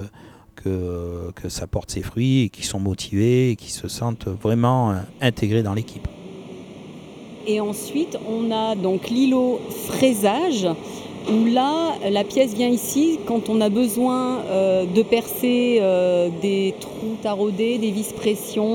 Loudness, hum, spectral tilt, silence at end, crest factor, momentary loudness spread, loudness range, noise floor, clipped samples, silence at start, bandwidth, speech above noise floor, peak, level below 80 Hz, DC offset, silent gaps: -21 LUFS; none; -6 dB/octave; 0 s; 18 dB; 13 LU; 6 LU; -46 dBFS; under 0.1%; 0 s; over 20 kHz; 25 dB; -4 dBFS; -48 dBFS; under 0.1%; none